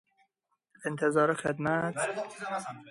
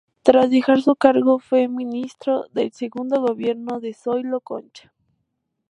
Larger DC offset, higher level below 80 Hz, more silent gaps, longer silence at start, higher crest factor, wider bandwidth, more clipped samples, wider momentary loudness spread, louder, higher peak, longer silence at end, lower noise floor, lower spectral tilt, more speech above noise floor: neither; about the same, -70 dBFS vs -66 dBFS; neither; first, 0.8 s vs 0.25 s; about the same, 18 dB vs 20 dB; first, 11.5 kHz vs 10 kHz; neither; about the same, 11 LU vs 12 LU; second, -31 LUFS vs -20 LUFS; second, -14 dBFS vs 0 dBFS; second, 0 s vs 0.9 s; first, -79 dBFS vs -75 dBFS; about the same, -5.5 dB/octave vs -6 dB/octave; second, 49 dB vs 55 dB